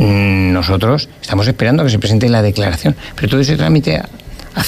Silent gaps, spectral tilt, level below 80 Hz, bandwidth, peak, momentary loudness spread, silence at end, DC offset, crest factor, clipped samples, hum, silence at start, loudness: none; -6.5 dB/octave; -32 dBFS; 15 kHz; -2 dBFS; 7 LU; 0 s; under 0.1%; 12 dB; under 0.1%; none; 0 s; -13 LUFS